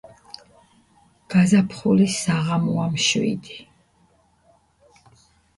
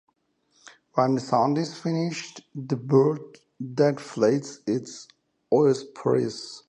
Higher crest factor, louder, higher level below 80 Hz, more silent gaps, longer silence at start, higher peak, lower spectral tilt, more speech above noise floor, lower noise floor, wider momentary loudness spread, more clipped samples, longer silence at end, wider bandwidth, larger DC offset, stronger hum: about the same, 18 dB vs 18 dB; first, -20 LUFS vs -25 LUFS; first, -58 dBFS vs -72 dBFS; neither; first, 1.3 s vs 0.95 s; about the same, -6 dBFS vs -8 dBFS; second, -5 dB/octave vs -6.5 dB/octave; second, 41 dB vs 45 dB; second, -60 dBFS vs -69 dBFS; first, 24 LU vs 14 LU; neither; first, 1.95 s vs 0.1 s; first, 11.5 kHz vs 9.6 kHz; neither; neither